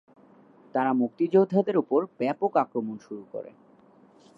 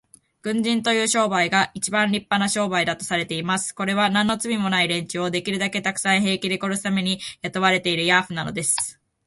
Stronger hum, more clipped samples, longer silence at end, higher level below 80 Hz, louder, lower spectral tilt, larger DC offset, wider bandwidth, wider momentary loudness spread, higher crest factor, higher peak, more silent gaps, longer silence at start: neither; neither; first, 0.9 s vs 0.35 s; second, -82 dBFS vs -60 dBFS; second, -26 LUFS vs -21 LUFS; first, -9 dB/octave vs -3 dB/octave; neither; second, 6.2 kHz vs 12 kHz; first, 17 LU vs 5 LU; about the same, 18 dB vs 20 dB; second, -10 dBFS vs -2 dBFS; neither; first, 0.75 s vs 0.45 s